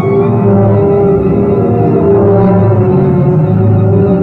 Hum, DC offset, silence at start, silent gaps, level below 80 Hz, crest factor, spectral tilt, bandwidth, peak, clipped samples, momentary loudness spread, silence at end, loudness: none; under 0.1%; 0 s; none; -30 dBFS; 8 dB; -12.5 dB/octave; 4 kHz; 0 dBFS; under 0.1%; 2 LU; 0 s; -9 LUFS